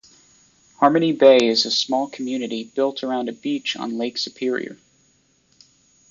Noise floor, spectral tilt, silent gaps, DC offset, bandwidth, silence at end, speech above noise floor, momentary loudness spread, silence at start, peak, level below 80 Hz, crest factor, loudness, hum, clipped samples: -61 dBFS; -4 dB/octave; none; under 0.1%; 7.6 kHz; 1.35 s; 42 dB; 13 LU; 0.8 s; -2 dBFS; -70 dBFS; 20 dB; -20 LUFS; none; under 0.1%